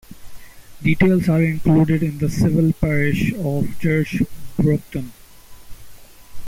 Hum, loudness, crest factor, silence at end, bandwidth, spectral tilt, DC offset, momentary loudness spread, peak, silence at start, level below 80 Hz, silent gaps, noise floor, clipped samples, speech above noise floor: none; -19 LUFS; 14 dB; 0 s; 16 kHz; -8 dB/octave; under 0.1%; 8 LU; -6 dBFS; 0.1 s; -38 dBFS; none; -40 dBFS; under 0.1%; 22 dB